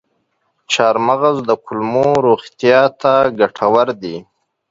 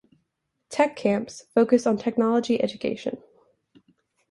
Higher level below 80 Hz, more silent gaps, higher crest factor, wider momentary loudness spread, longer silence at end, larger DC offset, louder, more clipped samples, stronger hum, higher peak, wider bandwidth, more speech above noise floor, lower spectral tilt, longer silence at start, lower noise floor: first, -56 dBFS vs -66 dBFS; neither; second, 14 dB vs 20 dB; second, 7 LU vs 12 LU; second, 0.5 s vs 1.15 s; neither; first, -14 LUFS vs -24 LUFS; neither; neither; first, 0 dBFS vs -6 dBFS; second, 7.8 kHz vs 11.5 kHz; about the same, 52 dB vs 54 dB; about the same, -5 dB/octave vs -5.5 dB/octave; about the same, 0.7 s vs 0.7 s; second, -66 dBFS vs -77 dBFS